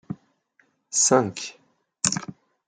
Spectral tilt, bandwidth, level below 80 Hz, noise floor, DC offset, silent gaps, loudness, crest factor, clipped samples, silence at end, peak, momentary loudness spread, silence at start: -2.5 dB/octave; 10.5 kHz; -68 dBFS; -66 dBFS; under 0.1%; none; -22 LUFS; 26 dB; under 0.1%; 0.35 s; -2 dBFS; 21 LU; 0.1 s